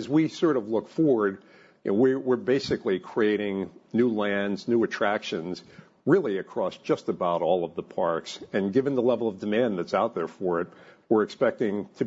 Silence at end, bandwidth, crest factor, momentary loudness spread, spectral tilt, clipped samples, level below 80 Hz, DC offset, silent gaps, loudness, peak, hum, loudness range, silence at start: 0 s; 8 kHz; 18 dB; 8 LU; -6.5 dB/octave; under 0.1%; -68 dBFS; under 0.1%; none; -26 LUFS; -8 dBFS; none; 2 LU; 0 s